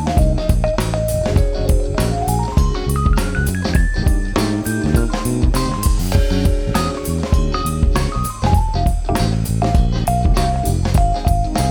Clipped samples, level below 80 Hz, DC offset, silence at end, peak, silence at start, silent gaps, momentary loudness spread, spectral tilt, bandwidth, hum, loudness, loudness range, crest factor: under 0.1%; -18 dBFS; under 0.1%; 0 s; 0 dBFS; 0 s; none; 3 LU; -6 dB/octave; 20 kHz; none; -18 LUFS; 1 LU; 16 dB